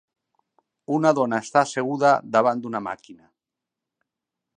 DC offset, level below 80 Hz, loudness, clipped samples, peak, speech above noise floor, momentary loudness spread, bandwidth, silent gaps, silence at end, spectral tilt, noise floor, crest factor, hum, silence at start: under 0.1%; -74 dBFS; -22 LUFS; under 0.1%; -4 dBFS; 65 dB; 11 LU; 10 kHz; none; 1.4 s; -5.5 dB/octave; -86 dBFS; 22 dB; none; 0.9 s